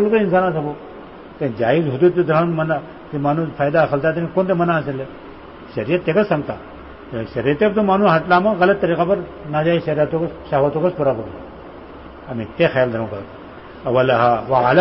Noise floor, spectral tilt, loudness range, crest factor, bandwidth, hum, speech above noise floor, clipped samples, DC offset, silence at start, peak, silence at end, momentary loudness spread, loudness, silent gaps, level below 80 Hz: -37 dBFS; -12 dB/octave; 4 LU; 16 dB; 5.8 kHz; none; 19 dB; under 0.1%; 0.1%; 0 s; -2 dBFS; 0 s; 22 LU; -18 LUFS; none; -48 dBFS